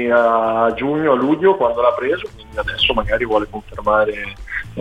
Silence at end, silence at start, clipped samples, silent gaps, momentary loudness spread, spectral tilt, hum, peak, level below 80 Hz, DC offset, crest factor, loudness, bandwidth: 0 s; 0 s; under 0.1%; none; 12 LU; -6 dB/octave; none; -2 dBFS; -38 dBFS; under 0.1%; 16 dB; -17 LUFS; 10 kHz